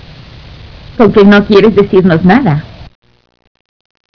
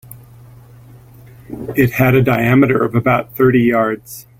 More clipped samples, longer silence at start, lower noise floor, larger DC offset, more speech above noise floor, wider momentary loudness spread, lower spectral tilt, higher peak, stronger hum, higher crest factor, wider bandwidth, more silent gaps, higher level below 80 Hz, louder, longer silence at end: first, 3% vs under 0.1%; first, 0.65 s vs 0.1 s; second, -32 dBFS vs -41 dBFS; neither; about the same, 26 dB vs 27 dB; about the same, 9 LU vs 11 LU; about the same, -8.5 dB/octave vs -7.5 dB/octave; about the same, 0 dBFS vs 0 dBFS; neither; about the same, 10 dB vs 14 dB; second, 5.4 kHz vs 17 kHz; neither; first, -34 dBFS vs -44 dBFS; first, -7 LUFS vs -14 LUFS; first, 1.3 s vs 0.2 s